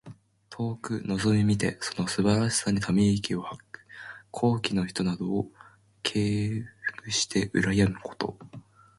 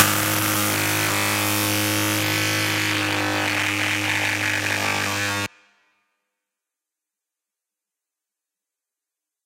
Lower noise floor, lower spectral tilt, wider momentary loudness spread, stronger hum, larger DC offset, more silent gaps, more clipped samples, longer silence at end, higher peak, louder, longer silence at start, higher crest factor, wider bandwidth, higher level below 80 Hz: second, -49 dBFS vs -87 dBFS; first, -5 dB/octave vs -2.5 dB/octave; first, 16 LU vs 2 LU; neither; neither; neither; neither; second, 0.4 s vs 4 s; second, -8 dBFS vs 0 dBFS; second, -27 LUFS vs -20 LUFS; about the same, 0.05 s vs 0 s; about the same, 20 dB vs 24 dB; second, 11.5 kHz vs 16 kHz; first, -52 dBFS vs -60 dBFS